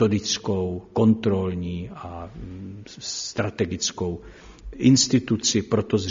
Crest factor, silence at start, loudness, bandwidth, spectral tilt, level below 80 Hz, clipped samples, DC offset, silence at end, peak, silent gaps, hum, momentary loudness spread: 18 dB; 0 s; -23 LUFS; 7.6 kHz; -5.5 dB/octave; -48 dBFS; under 0.1%; under 0.1%; 0 s; -6 dBFS; none; none; 19 LU